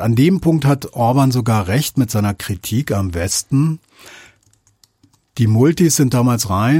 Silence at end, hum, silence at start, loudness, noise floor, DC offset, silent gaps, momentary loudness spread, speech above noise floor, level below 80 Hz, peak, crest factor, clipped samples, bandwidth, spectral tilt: 0 s; none; 0 s; -16 LUFS; -57 dBFS; under 0.1%; none; 7 LU; 42 dB; -44 dBFS; -2 dBFS; 14 dB; under 0.1%; 16.5 kHz; -5.5 dB/octave